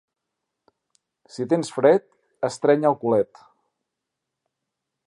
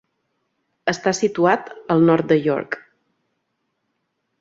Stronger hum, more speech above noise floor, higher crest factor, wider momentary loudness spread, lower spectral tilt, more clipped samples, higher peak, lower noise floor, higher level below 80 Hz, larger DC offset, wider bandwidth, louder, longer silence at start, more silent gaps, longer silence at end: neither; first, 62 dB vs 55 dB; about the same, 22 dB vs 20 dB; about the same, 12 LU vs 10 LU; about the same, -6 dB/octave vs -5.5 dB/octave; neither; about the same, -4 dBFS vs -2 dBFS; first, -83 dBFS vs -74 dBFS; second, -72 dBFS vs -64 dBFS; neither; first, 11 kHz vs 7.8 kHz; second, -22 LUFS vs -19 LUFS; first, 1.35 s vs 0.85 s; neither; first, 1.8 s vs 1.6 s